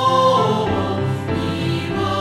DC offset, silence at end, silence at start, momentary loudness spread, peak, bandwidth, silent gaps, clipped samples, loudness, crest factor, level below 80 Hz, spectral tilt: under 0.1%; 0 s; 0 s; 7 LU; -4 dBFS; 14 kHz; none; under 0.1%; -19 LUFS; 14 dB; -44 dBFS; -6.5 dB/octave